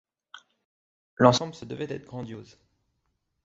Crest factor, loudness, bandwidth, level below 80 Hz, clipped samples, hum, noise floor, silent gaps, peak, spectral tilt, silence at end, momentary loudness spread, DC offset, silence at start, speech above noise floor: 28 dB; -25 LUFS; 7.8 kHz; -64 dBFS; under 0.1%; none; -77 dBFS; 0.65-1.17 s; -2 dBFS; -5.5 dB/octave; 1 s; 19 LU; under 0.1%; 0.35 s; 51 dB